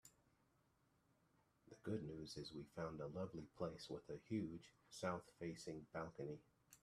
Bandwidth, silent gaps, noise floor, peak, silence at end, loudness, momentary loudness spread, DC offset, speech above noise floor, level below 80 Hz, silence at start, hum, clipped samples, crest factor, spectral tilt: 13.5 kHz; none; -81 dBFS; -30 dBFS; 0.05 s; -51 LUFS; 9 LU; under 0.1%; 30 dB; -76 dBFS; 0.05 s; none; under 0.1%; 22 dB; -6 dB/octave